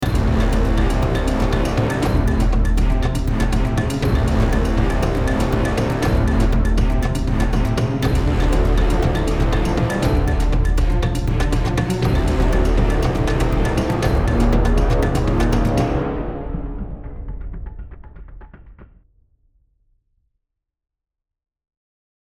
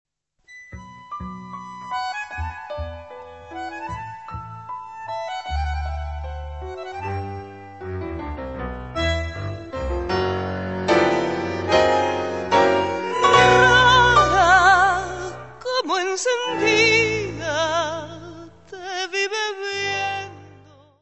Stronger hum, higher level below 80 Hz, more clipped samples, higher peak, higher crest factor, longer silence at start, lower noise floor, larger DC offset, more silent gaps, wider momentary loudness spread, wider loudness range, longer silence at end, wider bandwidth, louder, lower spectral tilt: neither; first, -20 dBFS vs -38 dBFS; neither; about the same, -4 dBFS vs -2 dBFS; second, 14 dB vs 20 dB; second, 0 s vs 0.5 s; first, -84 dBFS vs -52 dBFS; second, under 0.1% vs 0.2%; neither; second, 7 LU vs 22 LU; second, 7 LU vs 16 LU; first, 3.5 s vs 0.45 s; first, 12.5 kHz vs 8.4 kHz; about the same, -19 LUFS vs -20 LUFS; first, -7 dB/octave vs -4 dB/octave